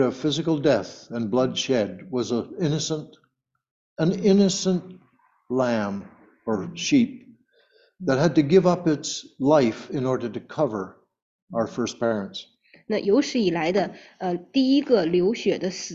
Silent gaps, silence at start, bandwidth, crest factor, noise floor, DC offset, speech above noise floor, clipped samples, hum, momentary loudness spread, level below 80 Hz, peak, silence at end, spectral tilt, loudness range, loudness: 3.71-3.96 s, 11.22-11.47 s; 0 s; 8 kHz; 18 dB; -71 dBFS; under 0.1%; 48 dB; under 0.1%; none; 12 LU; -62 dBFS; -6 dBFS; 0 s; -5.5 dB/octave; 5 LU; -24 LUFS